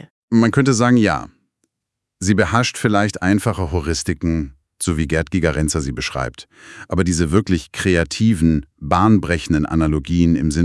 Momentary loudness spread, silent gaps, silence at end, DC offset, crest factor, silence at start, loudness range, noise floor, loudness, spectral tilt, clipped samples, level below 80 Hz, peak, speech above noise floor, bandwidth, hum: 9 LU; none; 0 s; under 0.1%; 18 dB; 0.3 s; 4 LU; -80 dBFS; -18 LUFS; -5.5 dB/octave; under 0.1%; -36 dBFS; 0 dBFS; 63 dB; 12 kHz; none